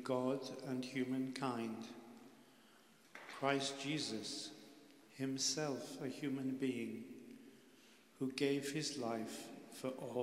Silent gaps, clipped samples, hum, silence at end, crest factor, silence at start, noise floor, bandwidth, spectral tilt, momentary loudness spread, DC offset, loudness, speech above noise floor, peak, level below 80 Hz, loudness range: none; under 0.1%; none; 0 s; 22 dB; 0 s; -67 dBFS; 16 kHz; -4 dB/octave; 21 LU; under 0.1%; -42 LUFS; 26 dB; -20 dBFS; -88 dBFS; 3 LU